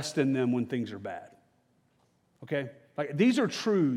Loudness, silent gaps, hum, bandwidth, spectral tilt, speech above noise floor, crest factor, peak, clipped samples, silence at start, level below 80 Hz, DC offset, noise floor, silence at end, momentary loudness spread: -30 LUFS; none; none; 13 kHz; -6 dB/octave; 41 dB; 16 dB; -14 dBFS; under 0.1%; 0 s; -82 dBFS; under 0.1%; -70 dBFS; 0 s; 15 LU